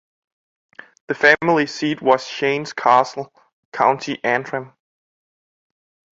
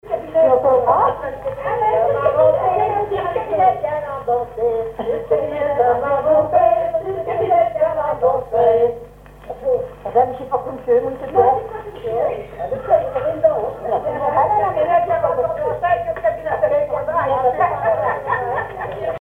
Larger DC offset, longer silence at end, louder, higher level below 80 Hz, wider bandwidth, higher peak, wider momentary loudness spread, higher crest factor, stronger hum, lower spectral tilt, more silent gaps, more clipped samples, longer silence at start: neither; first, 1.5 s vs 0 s; about the same, -18 LUFS vs -18 LUFS; second, -66 dBFS vs -46 dBFS; first, 7.8 kHz vs 4 kHz; about the same, 0 dBFS vs -2 dBFS; first, 15 LU vs 9 LU; about the same, 20 dB vs 16 dB; neither; second, -4.5 dB/octave vs -7.5 dB/octave; first, 3.53-3.72 s vs none; neither; first, 1.1 s vs 0.05 s